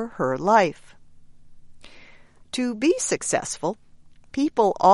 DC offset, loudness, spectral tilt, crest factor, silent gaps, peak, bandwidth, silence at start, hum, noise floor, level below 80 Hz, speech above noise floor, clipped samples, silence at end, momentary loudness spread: under 0.1%; -23 LUFS; -4 dB/octave; 20 dB; none; -4 dBFS; 11.5 kHz; 0 s; none; -48 dBFS; -56 dBFS; 27 dB; under 0.1%; 0 s; 12 LU